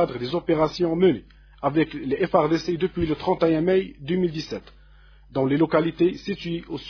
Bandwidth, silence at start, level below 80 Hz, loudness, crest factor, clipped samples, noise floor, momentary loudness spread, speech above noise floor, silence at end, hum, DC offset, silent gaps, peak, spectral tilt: 5.4 kHz; 0 s; -48 dBFS; -23 LUFS; 20 dB; under 0.1%; -50 dBFS; 10 LU; 28 dB; 0 s; none; under 0.1%; none; -4 dBFS; -7.5 dB/octave